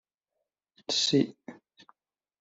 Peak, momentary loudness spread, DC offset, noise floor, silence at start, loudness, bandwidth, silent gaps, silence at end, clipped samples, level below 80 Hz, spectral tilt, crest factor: -12 dBFS; 25 LU; under 0.1%; -85 dBFS; 0.9 s; -27 LUFS; 8.2 kHz; none; 0.85 s; under 0.1%; -74 dBFS; -4 dB/octave; 22 dB